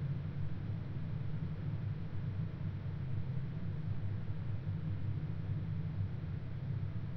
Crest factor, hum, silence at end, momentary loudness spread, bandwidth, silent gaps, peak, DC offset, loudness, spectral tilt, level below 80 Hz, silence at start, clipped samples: 12 dB; none; 0 s; 2 LU; 5.4 kHz; none; -26 dBFS; under 0.1%; -41 LUFS; -10.5 dB/octave; -52 dBFS; 0 s; under 0.1%